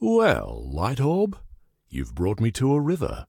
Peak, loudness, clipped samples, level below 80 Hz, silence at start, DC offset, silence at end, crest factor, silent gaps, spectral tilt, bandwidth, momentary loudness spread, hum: -6 dBFS; -24 LUFS; under 0.1%; -40 dBFS; 0 s; under 0.1%; 0.05 s; 16 dB; none; -7 dB/octave; 17 kHz; 13 LU; none